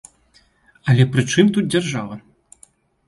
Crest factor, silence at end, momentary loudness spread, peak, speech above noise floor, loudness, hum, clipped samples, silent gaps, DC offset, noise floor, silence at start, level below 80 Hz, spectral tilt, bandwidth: 18 dB; 0.9 s; 14 LU; -2 dBFS; 40 dB; -18 LUFS; none; under 0.1%; none; under 0.1%; -57 dBFS; 0.85 s; -54 dBFS; -6 dB/octave; 11.5 kHz